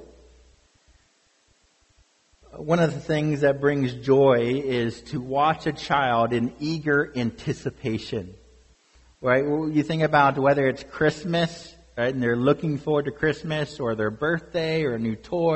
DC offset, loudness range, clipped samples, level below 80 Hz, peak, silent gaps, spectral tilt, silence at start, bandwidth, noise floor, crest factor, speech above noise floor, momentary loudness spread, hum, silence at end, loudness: under 0.1%; 4 LU; under 0.1%; -54 dBFS; -6 dBFS; none; -6.5 dB/octave; 0 s; 8.4 kHz; -64 dBFS; 20 dB; 41 dB; 10 LU; none; 0 s; -24 LUFS